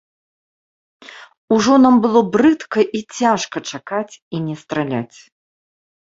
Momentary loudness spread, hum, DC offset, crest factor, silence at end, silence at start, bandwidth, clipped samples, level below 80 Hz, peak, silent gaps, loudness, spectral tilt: 14 LU; none; under 0.1%; 16 dB; 0.95 s; 1.1 s; 7.8 kHz; under 0.1%; -58 dBFS; -2 dBFS; 1.37-1.48 s, 4.22-4.31 s; -17 LUFS; -5.5 dB/octave